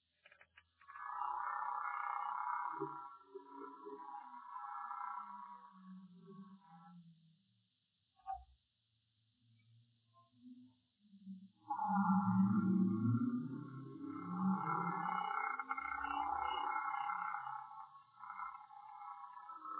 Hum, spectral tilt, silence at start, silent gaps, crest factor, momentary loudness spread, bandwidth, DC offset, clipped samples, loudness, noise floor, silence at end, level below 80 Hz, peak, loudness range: none; -6 dB/octave; 0.55 s; none; 20 dB; 23 LU; 4 kHz; under 0.1%; under 0.1%; -41 LUFS; -83 dBFS; 0 s; -78 dBFS; -24 dBFS; 21 LU